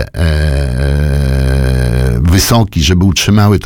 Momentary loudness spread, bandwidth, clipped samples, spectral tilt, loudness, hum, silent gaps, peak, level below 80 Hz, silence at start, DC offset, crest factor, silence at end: 5 LU; 17.5 kHz; under 0.1%; -5.5 dB/octave; -11 LUFS; none; none; 0 dBFS; -16 dBFS; 0 s; under 0.1%; 10 dB; 0 s